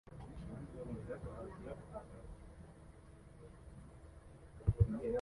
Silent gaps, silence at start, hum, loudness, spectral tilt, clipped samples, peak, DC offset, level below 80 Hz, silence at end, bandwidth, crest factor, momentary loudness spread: none; 0.05 s; none; -43 LUFS; -9 dB/octave; under 0.1%; -18 dBFS; under 0.1%; -52 dBFS; 0 s; 11.5 kHz; 26 dB; 23 LU